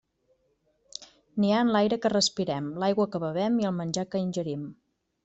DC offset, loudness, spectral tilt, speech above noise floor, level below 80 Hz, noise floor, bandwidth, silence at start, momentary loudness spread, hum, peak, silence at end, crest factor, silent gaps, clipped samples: under 0.1%; -27 LUFS; -5 dB/octave; 45 dB; -66 dBFS; -71 dBFS; 8.2 kHz; 1 s; 19 LU; none; -10 dBFS; 0.5 s; 18 dB; none; under 0.1%